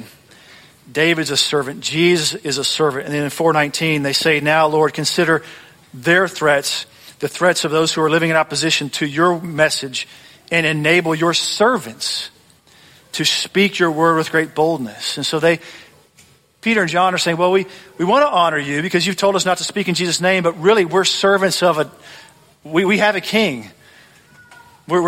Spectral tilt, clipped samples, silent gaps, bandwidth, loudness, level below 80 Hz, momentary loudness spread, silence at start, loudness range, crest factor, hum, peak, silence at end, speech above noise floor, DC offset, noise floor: -3.5 dB/octave; under 0.1%; none; 16.5 kHz; -16 LUFS; -60 dBFS; 8 LU; 0 s; 2 LU; 16 dB; none; -2 dBFS; 0 s; 35 dB; under 0.1%; -51 dBFS